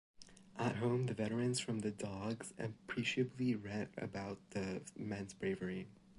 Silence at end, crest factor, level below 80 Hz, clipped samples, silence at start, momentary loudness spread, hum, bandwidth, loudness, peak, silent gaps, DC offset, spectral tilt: 0 s; 16 dB; -68 dBFS; under 0.1%; 0.2 s; 9 LU; none; 11.5 kHz; -41 LUFS; -24 dBFS; none; under 0.1%; -5.5 dB/octave